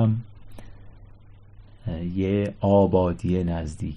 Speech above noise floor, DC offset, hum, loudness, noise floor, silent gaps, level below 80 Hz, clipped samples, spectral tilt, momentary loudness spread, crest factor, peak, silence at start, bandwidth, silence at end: 24 dB; under 0.1%; none; -24 LUFS; -47 dBFS; none; -40 dBFS; under 0.1%; -9 dB/octave; 14 LU; 18 dB; -6 dBFS; 0 s; 10 kHz; 0 s